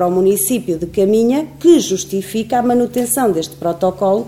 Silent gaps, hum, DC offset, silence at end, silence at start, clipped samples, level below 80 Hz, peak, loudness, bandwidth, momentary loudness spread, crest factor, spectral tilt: none; none; 0.2%; 0 s; 0 s; under 0.1%; -48 dBFS; 0 dBFS; -15 LUFS; 16.5 kHz; 8 LU; 14 dB; -5 dB/octave